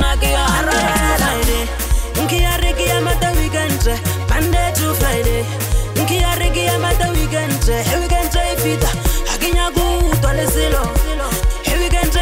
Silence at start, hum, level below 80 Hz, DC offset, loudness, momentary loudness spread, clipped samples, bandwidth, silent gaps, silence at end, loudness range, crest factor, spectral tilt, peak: 0 s; none; -18 dBFS; under 0.1%; -17 LUFS; 4 LU; under 0.1%; 16.5 kHz; none; 0 s; 1 LU; 12 dB; -4 dB/octave; -4 dBFS